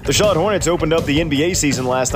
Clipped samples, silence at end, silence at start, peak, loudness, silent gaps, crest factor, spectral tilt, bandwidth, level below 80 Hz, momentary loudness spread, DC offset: under 0.1%; 0 s; 0 s; -4 dBFS; -16 LUFS; none; 12 dB; -4 dB/octave; 16 kHz; -34 dBFS; 3 LU; under 0.1%